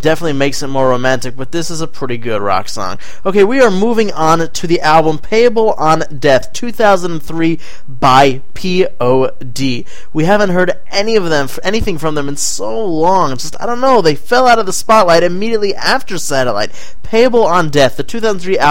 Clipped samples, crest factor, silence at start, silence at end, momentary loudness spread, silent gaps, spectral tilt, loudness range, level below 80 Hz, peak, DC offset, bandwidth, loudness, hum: 0.1%; 14 dB; 0.05 s; 0 s; 10 LU; none; -4.5 dB/octave; 3 LU; -38 dBFS; 0 dBFS; 20%; 17 kHz; -13 LUFS; none